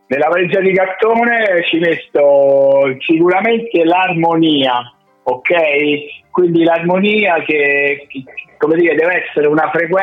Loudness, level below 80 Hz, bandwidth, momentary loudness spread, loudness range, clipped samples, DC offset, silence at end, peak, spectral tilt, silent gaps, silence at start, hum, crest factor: -13 LUFS; -62 dBFS; 4.6 kHz; 7 LU; 2 LU; under 0.1%; under 0.1%; 0 s; -2 dBFS; -7.5 dB/octave; none; 0.1 s; none; 10 dB